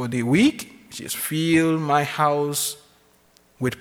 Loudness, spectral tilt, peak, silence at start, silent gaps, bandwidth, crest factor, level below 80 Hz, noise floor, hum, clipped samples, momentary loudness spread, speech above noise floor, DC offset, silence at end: -21 LUFS; -4.5 dB/octave; -6 dBFS; 0 s; none; 20 kHz; 16 dB; -58 dBFS; -58 dBFS; none; under 0.1%; 17 LU; 37 dB; under 0.1%; 0 s